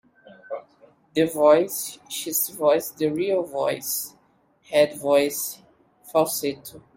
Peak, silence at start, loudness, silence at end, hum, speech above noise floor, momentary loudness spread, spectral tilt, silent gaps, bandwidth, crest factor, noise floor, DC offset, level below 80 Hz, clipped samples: -4 dBFS; 0.3 s; -23 LUFS; 0.15 s; none; 39 dB; 18 LU; -3.5 dB/octave; none; 16.5 kHz; 20 dB; -62 dBFS; under 0.1%; -68 dBFS; under 0.1%